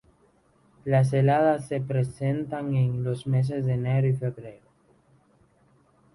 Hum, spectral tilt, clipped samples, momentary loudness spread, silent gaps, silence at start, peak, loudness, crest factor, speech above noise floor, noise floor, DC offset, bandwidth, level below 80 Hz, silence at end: none; -8.5 dB/octave; under 0.1%; 9 LU; none; 0.85 s; -10 dBFS; -25 LUFS; 16 dB; 38 dB; -63 dBFS; under 0.1%; 11.5 kHz; -58 dBFS; 1.6 s